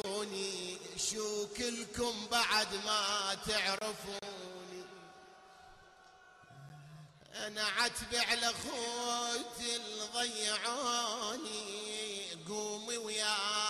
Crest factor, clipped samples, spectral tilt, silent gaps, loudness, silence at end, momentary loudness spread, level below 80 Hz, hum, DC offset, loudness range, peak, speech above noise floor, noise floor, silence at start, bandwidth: 20 dB; under 0.1%; -1 dB/octave; none; -35 LUFS; 0 s; 16 LU; -66 dBFS; none; under 0.1%; 10 LU; -18 dBFS; 24 dB; -60 dBFS; 0.05 s; 13.5 kHz